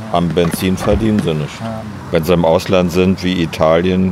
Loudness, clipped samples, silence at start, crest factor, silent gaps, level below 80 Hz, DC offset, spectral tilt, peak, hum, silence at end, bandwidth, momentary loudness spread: -15 LUFS; under 0.1%; 0 s; 14 dB; none; -34 dBFS; under 0.1%; -6.5 dB/octave; 0 dBFS; none; 0 s; 16 kHz; 9 LU